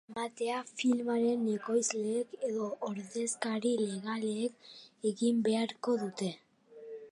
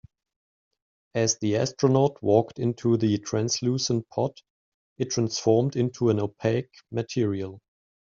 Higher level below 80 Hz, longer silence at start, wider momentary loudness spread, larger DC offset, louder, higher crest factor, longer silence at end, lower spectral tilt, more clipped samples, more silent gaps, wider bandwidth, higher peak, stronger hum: second, -84 dBFS vs -64 dBFS; second, 0.1 s vs 1.15 s; about the same, 9 LU vs 8 LU; neither; second, -34 LUFS vs -25 LUFS; about the same, 20 dB vs 20 dB; second, 0 s vs 0.4 s; second, -4.5 dB/octave vs -6.5 dB/octave; neither; second, none vs 4.50-4.96 s; first, 11.5 kHz vs 7.6 kHz; second, -14 dBFS vs -6 dBFS; neither